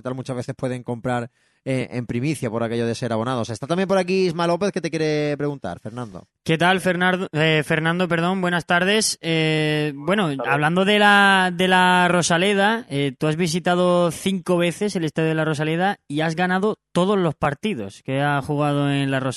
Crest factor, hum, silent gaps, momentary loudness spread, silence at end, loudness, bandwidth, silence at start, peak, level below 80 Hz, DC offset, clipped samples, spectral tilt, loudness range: 18 dB; none; none; 10 LU; 0 s; -20 LUFS; 12.5 kHz; 0.05 s; -2 dBFS; -58 dBFS; under 0.1%; under 0.1%; -5 dB/octave; 6 LU